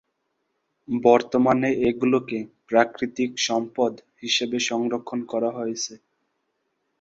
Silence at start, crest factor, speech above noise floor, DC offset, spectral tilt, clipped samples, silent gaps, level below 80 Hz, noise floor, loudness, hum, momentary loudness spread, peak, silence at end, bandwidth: 0.9 s; 22 dB; 52 dB; under 0.1%; -4 dB/octave; under 0.1%; none; -62 dBFS; -75 dBFS; -23 LUFS; none; 11 LU; -2 dBFS; 1.05 s; 8 kHz